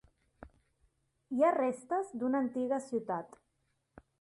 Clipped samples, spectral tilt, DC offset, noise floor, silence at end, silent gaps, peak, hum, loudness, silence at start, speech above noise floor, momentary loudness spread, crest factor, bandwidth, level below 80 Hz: under 0.1%; -6.5 dB/octave; under 0.1%; -79 dBFS; 0.95 s; none; -18 dBFS; none; -33 LUFS; 0.4 s; 46 dB; 11 LU; 18 dB; 11.5 kHz; -70 dBFS